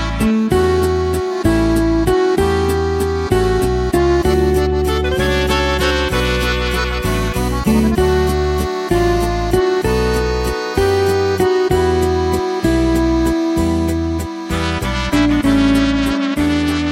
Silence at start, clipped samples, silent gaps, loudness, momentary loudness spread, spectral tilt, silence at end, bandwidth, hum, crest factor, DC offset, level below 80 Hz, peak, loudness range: 0 s; under 0.1%; none; -16 LUFS; 4 LU; -6 dB/octave; 0 s; 16.5 kHz; none; 14 dB; under 0.1%; -24 dBFS; -2 dBFS; 1 LU